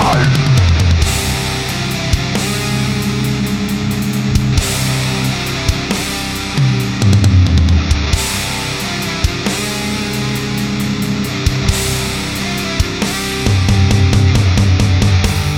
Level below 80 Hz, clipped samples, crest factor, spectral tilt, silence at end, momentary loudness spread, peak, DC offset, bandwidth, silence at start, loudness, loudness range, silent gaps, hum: -22 dBFS; under 0.1%; 14 dB; -5 dB/octave; 0 s; 6 LU; 0 dBFS; under 0.1%; 17.5 kHz; 0 s; -15 LUFS; 3 LU; none; none